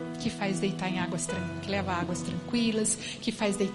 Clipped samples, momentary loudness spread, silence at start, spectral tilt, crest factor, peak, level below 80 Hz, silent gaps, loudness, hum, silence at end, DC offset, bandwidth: under 0.1%; 6 LU; 0 s; -4 dB/octave; 16 dB; -14 dBFS; -58 dBFS; none; -30 LUFS; none; 0 s; under 0.1%; 11.5 kHz